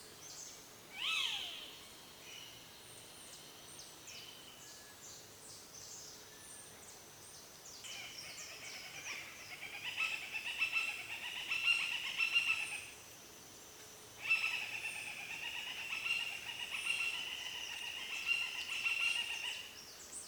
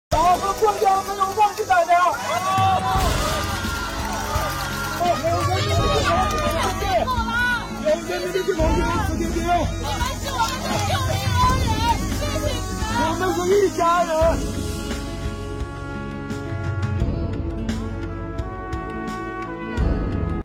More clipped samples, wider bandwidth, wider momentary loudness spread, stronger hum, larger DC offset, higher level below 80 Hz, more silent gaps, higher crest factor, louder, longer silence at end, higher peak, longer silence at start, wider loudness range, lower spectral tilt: neither; first, over 20 kHz vs 17 kHz; first, 19 LU vs 11 LU; neither; neither; second, -76 dBFS vs -32 dBFS; neither; first, 22 dB vs 12 dB; second, -38 LUFS vs -22 LUFS; about the same, 0 s vs 0 s; second, -22 dBFS vs -10 dBFS; about the same, 0 s vs 0.1 s; first, 15 LU vs 7 LU; second, 0.5 dB/octave vs -5 dB/octave